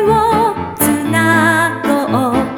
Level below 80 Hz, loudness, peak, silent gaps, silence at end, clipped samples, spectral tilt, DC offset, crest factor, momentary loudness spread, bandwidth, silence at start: -40 dBFS; -13 LUFS; 0 dBFS; none; 0 s; under 0.1%; -5 dB/octave; under 0.1%; 14 dB; 5 LU; 19.5 kHz; 0 s